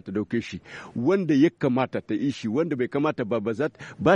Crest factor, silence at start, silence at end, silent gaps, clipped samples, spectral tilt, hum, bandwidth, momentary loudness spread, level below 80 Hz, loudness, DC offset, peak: 18 dB; 0.05 s; 0 s; none; under 0.1%; -7.5 dB/octave; none; 9.4 kHz; 9 LU; -62 dBFS; -25 LUFS; under 0.1%; -8 dBFS